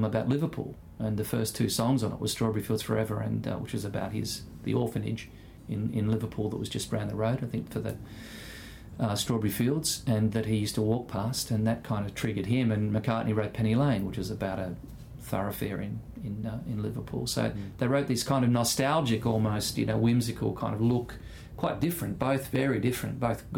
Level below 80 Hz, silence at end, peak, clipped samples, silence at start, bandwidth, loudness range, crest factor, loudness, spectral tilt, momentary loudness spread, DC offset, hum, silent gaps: -52 dBFS; 0 s; -12 dBFS; under 0.1%; 0 s; 18 kHz; 5 LU; 16 dB; -30 LUFS; -5.5 dB/octave; 11 LU; under 0.1%; none; none